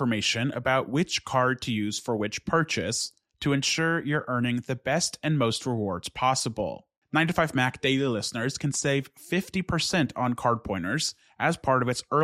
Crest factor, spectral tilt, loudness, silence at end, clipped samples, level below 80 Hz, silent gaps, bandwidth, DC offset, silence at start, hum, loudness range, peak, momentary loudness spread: 18 dB; -4 dB/octave; -27 LUFS; 0 s; under 0.1%; -56 dBFS; 6.98-7.02 s; 15 kHz; under 0.1%; 0 s; none; 1 LU; -8 dBFS; 5 LU